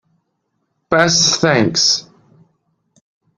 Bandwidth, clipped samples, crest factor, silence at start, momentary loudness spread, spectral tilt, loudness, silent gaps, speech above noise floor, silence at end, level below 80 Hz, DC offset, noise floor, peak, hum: 11 kHz; under 0.1%; 18 dB; 0.9 s; 6 LU; -2.5 dB/octave; -13 LUFS; none; 56 dB; 1.35 s; -54 dBFS; under 0.1%; -70 dBFS; 0 dBFS; none